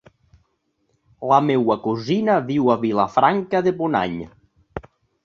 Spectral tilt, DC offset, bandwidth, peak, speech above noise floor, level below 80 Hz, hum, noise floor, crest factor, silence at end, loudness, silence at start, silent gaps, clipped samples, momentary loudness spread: -7.5 dB/octave; under 0.1%; 7.2 kHz; -2 dBFS; 50 dB; -54 dBFS; none; -69 dBFS; 20 dB; 0.45 s; -19 LUFS; 1.2 s; none; under 0.1%; 20 LU